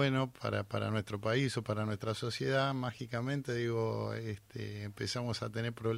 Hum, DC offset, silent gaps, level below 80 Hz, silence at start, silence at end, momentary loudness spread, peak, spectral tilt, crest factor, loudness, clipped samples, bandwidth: none; under 0.1%; none; -66 dBFS; 0 s; 0 s; 8 LU; -18 dBFS; -6 dB/octave; 16 dB; -36 LUFS; under 0.1%; 15.5 kHz